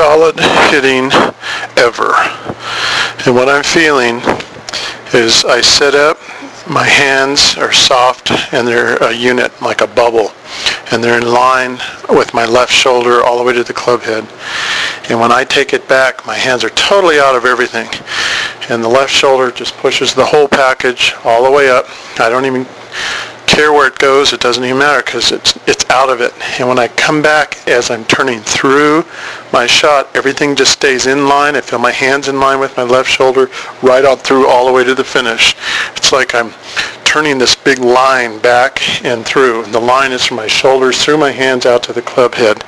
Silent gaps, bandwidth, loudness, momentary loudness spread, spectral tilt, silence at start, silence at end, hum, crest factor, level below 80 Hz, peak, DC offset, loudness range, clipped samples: none; 11 kHz; -9 LUFS; 8 LU; -2.5 dB/octave; 0 s; 0 s; none; 10 dB; -44 dBFS; 0 dBFS; under 0.1%; 2 LU; 0.5%